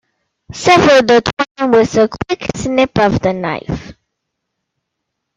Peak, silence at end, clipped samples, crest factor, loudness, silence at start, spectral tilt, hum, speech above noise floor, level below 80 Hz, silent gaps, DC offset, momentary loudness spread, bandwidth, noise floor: 0 dBFS; 1.45 s; under 0.1%; 14 dB; -13 LUFS; 0.5 s; -5 dB/octave; none; 63 dB; -40 dBFS; 1.33-1.37 s, 1.51-1.55 s; under 0.1%; 13 LU; 10.5 kHz; -75 dBFS